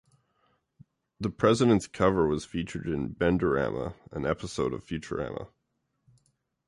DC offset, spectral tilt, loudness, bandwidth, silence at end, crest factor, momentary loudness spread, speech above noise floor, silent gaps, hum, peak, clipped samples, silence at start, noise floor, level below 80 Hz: under 0.1%; -6.5 dB/octave; -28 LUFS; 11.5 kHz; 1.2 s; 20 dB; 12 LU; 50 dB; none; none; -8 dBFS; under 0.1%; 1.2 s; -78 dBFS; -50 dBFS